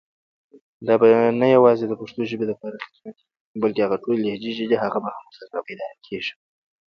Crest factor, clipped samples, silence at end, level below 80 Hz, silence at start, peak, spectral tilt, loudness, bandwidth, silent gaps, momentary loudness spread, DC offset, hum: 18 dB; under 0.1%; 0.55 s; -66 dBFS; 0.8 s; -4 dBFS; -7.5 dB/octave; -21 LUFS; 6.4 kHz; 3.40-3.54 s; 19 LU; under 0.1%; none